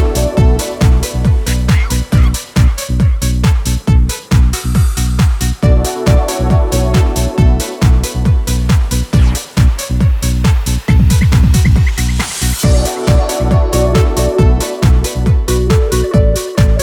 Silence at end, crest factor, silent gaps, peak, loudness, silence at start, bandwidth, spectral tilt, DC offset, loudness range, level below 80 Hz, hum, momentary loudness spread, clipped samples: 0 s; 10 dB; none; 0 dBFS; -13 LUFS; 0 s; 17 kHz; -6 dB/octave; under 0.1%; 1 LU; -14 dBFS; none; 3 LU; under 0.1%